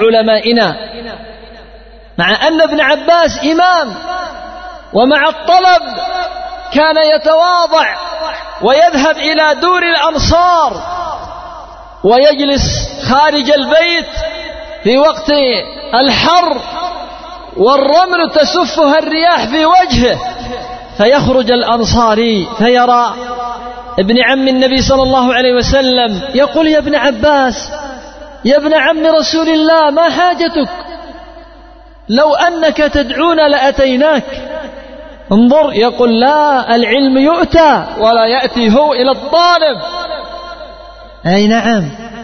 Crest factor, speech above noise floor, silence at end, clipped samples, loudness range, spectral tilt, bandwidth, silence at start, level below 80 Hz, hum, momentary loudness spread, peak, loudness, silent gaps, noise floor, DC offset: 10 dB; 27 dB; 0 s; under 0.1%; 3 LU; -4.5 dB/octave; 6.6 kHz; 0 s; -32 dBFS; none; 15 LU; 0 dBFS; -10 LUFS; none; -36 dBFS; under 0.1%